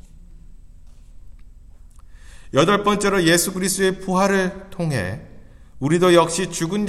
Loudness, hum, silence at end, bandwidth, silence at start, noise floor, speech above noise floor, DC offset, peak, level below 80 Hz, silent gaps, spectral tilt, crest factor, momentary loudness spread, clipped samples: -19 LUFS; none; 0 s; 15.5 kHz; 0.15 s; -43 dBFS; 24 dB; under 0.1%; 0 dBFS; -44 dBFS; none; -4.5 dB/octave; 22 dB; 11 LU; under 0.1%